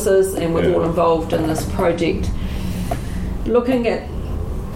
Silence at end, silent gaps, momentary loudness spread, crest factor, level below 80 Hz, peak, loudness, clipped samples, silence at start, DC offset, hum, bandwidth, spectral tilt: 0 s; none; 10 LU; 14 dB; -28 dBFS; -4 dBFS; -20 LUFS; under 0.1%; 0 s; under 0.1%; none; 16.5 kHz; -6.5 dB/octave